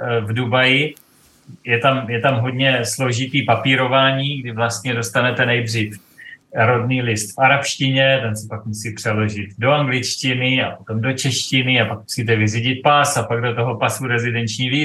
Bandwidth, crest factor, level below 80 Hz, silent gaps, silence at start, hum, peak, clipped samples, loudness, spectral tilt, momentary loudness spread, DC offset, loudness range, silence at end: 12.5 kHz; 16 dB; -62 dBFS; none; 0 s; none; -2 dBFS; under 0.1%; -18 LUFS; -4.5 dB/octave; 8 LU; under 0.1%; 2 LU; 0 s